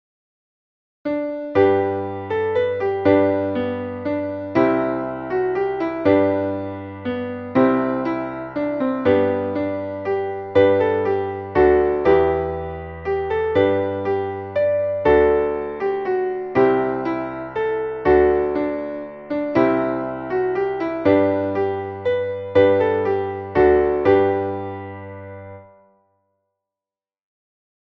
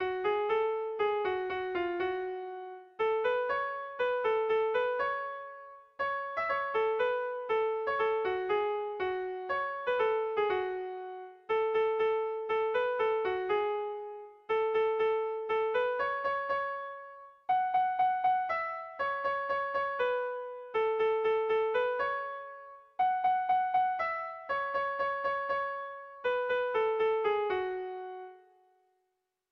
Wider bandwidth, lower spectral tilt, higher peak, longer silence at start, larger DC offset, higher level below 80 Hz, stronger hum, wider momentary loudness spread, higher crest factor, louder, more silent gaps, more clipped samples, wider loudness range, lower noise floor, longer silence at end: about the same, 5.8 kHz vs 5.8 kHz; first, -9 dB/octave vs -5.5 dB/octave; first, -4 dBFS vs -20 dBFS; first, 1.05 s vs 0 s; neither; first, -44 dBFS vs -70 dBFS; neither; about the same, 11 LU vs 11 LU; about the same, 16 dB vs 12 dB; first, -20 LUFS vs -32 LUFS; neither; neither; about the same, 2 LU vs 2 LU; first, under -90 dBFS vs -82 dBFS; first, 2.3 s vs 1.15 s